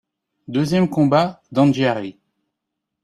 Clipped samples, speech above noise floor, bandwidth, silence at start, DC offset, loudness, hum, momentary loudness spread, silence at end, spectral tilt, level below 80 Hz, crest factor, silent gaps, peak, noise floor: under 0.1%; 62 dB; 12.5 kHz; 0.5 s; under 0.1%; -18 LUFS; none; 10 LU; 0.9 s; -7 dB/octave; -58 dBFS; 18 dB; none; -2 dBFS; -80 dBFS